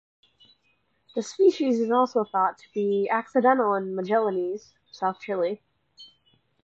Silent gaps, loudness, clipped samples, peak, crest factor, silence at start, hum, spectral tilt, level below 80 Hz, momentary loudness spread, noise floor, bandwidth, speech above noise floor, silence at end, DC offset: none; -25 LUFS; under 0.1%; -8 dBFS; 18 dB; 1.15 s; none; -6 dB/octave; -78 dBFS; 12 LU; -70 dBFS; 8 kHz; 46 dB; 0.6 s; under 0.1%